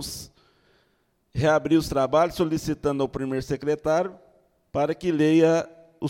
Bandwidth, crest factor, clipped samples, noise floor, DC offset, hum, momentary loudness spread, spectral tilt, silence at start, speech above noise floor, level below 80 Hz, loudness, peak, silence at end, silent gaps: 16.5 kHz; 18 dB; under 0.1%; -68 dBFS; under 0.1%; none; 13 LU; -6 dB/octave; 0 s; 46 dB; -50 dBFS; -24 LUFS; -8 dBFS; 0 s; none